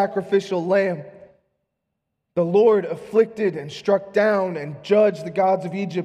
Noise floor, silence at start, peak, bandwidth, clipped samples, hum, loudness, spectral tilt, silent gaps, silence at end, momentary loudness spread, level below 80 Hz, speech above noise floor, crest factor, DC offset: -78 dBFS; 0 s; -6 dBFS; 9.8 kHz; under 0.1%; none; -21 LUFS; -7 dB/octave; none; 0 s; 9 LU; -70 dBFS; 58 dB; 16 dB; under 0.1%